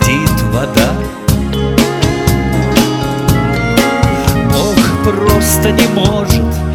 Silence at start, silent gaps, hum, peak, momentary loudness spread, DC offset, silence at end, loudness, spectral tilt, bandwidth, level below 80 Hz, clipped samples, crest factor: 0 s; none; none; 0 dBFS; 4 LU; under 0.1%; 0 s; -12 LUFS; -5 dB/octave; 18.5 kHz; -22 dBFS; 0.2%; 12 dB